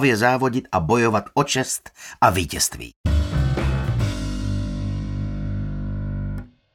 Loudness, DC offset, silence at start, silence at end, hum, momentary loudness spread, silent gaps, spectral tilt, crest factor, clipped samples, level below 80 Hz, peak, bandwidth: -22 LUFS; under 0.1%; 0 s; 0.3 s; none; 10 LU; 2.96-3.04 s; -5 dB/octave; 20 dB; under 0.1%; -30 dBFS; -2 dBFS; 18 kHz